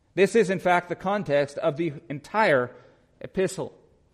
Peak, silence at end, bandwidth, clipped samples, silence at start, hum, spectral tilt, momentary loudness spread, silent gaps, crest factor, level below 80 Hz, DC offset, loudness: -8 dBFS; 0.45 s; 14 kHz; under 0.1%; 0.15 s; none; -5.5 dB/octave; 14 LU; none; 18 dB; -62 dBFS; under 0.1%; -25 LUFS